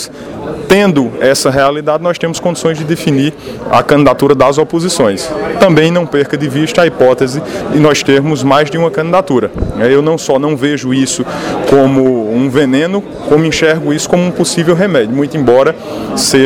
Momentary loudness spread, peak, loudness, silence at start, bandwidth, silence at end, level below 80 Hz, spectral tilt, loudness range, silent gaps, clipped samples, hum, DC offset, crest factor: 7 LU; 0 dBFS; -11 LUFS; 0 s; 18.5 kHz; 0 s; -36 dBFS; -5 dB/octave; 1 LU; none; 0.5%; none; under 0.1%; 10 dB